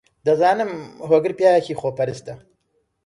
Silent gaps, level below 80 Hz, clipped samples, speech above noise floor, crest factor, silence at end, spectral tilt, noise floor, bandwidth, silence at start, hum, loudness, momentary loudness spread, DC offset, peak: none; -62 dBFS; under 0.1%; 50 dB; 18 dB; 0.7 s; -6 dB/octave; -69 dBFS; 11.5 kHz; 0.25 s; none; -19 LUFS; 15 LU; under 0.1%; -4 dBFS